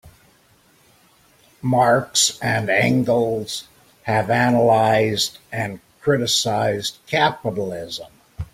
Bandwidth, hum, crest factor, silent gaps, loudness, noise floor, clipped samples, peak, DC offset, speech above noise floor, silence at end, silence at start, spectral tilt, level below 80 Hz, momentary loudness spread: 16.5 kHz; none; 18 dB; none; -19 LUFS; -56 dBFS; under 0.1%; -4 dBFS; under 0.1%; 37 dB; 0.1 s; 0.05 s; -4 dB/octave; -52 dBFS; 13 LU